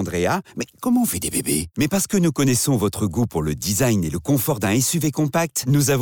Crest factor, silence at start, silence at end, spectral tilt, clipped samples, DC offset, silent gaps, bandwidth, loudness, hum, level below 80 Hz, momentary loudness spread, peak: 12 dB; 0 s; 0 s; -5 dB/octave; under 0.1%; under 0.1%; none; over 20 kHz; -20 LUFS; none; -46 dBFS; 4 LU; -8 dBFS